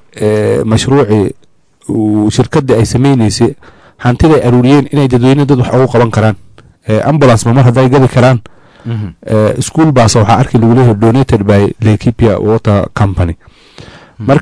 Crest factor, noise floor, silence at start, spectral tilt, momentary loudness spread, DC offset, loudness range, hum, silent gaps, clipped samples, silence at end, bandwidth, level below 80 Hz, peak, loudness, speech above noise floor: 8 dB; -34 dBFS; 0.15 s; -7 dB/octave; 9 LU; under 0.1%; 2 LU; none; none; under 0.1%; 0 s; 11 kHz; -30 dBFS; 0 dBFS; -9 LUFS; 26 dB